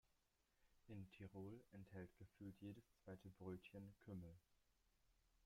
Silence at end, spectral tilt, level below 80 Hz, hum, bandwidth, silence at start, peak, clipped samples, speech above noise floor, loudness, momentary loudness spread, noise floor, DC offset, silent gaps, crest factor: 0 s; -8 dB/octave; -80 dBFS; none; 16 kHz; 0.05 s; -44 dBFS; under 0.1%; 27 dB; -60 LUFS; 5 LU; -86 dBFS; under 0.1%; none; 18 dB